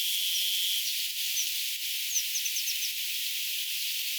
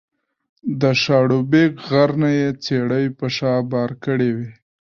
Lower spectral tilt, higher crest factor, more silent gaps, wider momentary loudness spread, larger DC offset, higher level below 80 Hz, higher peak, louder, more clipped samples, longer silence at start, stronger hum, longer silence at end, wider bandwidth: second, 13.5 dB/octave vs -7 dB/octave; about the same, 16 dB vs 16 dB; neither; second, 4 LU vs 7 LU; neither; second, under -90 dBFS vs -58 dBFS; second, -16 dBFS vs -2 dBFS; second, -28 LUFS vs -18 LUFS; neither; second, 0 s vs 0.65 s; neither; second, 0 s vs 0.45 s; first, over 20 kHz vs 7 kHz